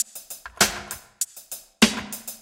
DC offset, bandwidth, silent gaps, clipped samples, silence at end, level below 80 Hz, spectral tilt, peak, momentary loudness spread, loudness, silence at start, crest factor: under 0.1%; 17 kHz; none; under 0.1%; 0.05 s; -52 dBFS; -2 dB/octave; 0 dBFS; 17 LU; -23 LUFS; 0 s; 26 dB